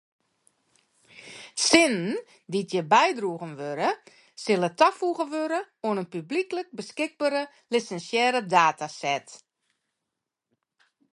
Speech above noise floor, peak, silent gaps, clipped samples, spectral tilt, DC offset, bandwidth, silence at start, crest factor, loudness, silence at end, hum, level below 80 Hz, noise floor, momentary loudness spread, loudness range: 59 dB; 0 dBFS; none; under 0.1%; -3.5 dB/octave; under 0.1%; 11.5 kHz; 1.15 s; 26 dB; -25 LUFS; 1.8 s; none; -74 dBFS; -85 dBFS; 14 LU; 3 LU